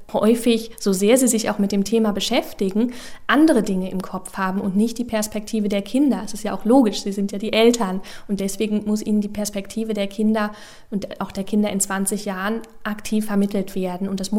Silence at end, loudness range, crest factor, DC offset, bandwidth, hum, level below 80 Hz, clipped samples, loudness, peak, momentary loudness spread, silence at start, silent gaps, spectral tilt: 0 s; 4 LU; 20 dB; under 0.1%; 16.5 kHz; none; -48 dBFS; under 0.1%; -21 LUFS; -2 dBFS; 11 LU; 0 s; none; -4.5 dB/octave